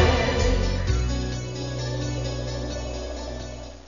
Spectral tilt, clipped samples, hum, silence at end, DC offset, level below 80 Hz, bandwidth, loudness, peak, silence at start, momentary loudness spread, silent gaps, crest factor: -5.5 dB/octave; under 0.1%; none; 0 s; 0.4%; -30 dBFS; 7.4 kHz; -27 LUFS; -6 dBFS; 0 s; 11 LU; none; 20 dB